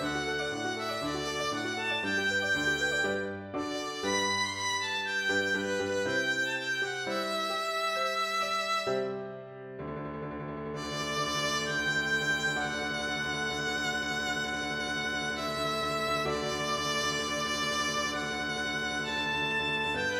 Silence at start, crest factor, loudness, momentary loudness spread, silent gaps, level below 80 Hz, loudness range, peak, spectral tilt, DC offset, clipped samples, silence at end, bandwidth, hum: 0 s; 14 dB; -30 LUFS; 7 LU; none; -58 dBFS; 2 LU; -16 dBFS; -2.5 dB/octave; under 0.1%; under 0.1%; 0 s; 17.5 kHz; none